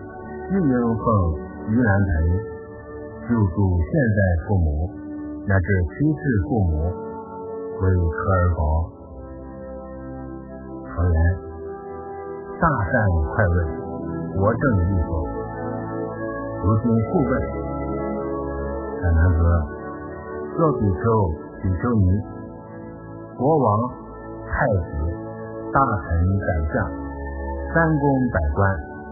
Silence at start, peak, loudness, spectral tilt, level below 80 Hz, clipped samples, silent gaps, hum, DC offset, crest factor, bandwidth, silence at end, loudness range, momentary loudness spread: 0 s; -4 dBFS; -22 LUFS; -15.5 dB/octave; -30 dBFS; under 0.1%; none; none; under 0.1%; 18 dB; 2.1 kHz; 0 s; 3 LU; 15 LU